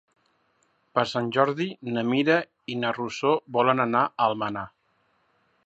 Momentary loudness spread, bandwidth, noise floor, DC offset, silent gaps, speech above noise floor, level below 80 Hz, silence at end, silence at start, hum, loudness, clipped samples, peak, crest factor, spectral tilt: 8 LU; 8.2 kHz; -69 dBFS; under 0.1%; none; 44 dB; -68 dBFS; 1 s; 0.95 s; none; -25 LUFS; under 0.1%; -6 dBFS; 22 dB; -6 dB/octave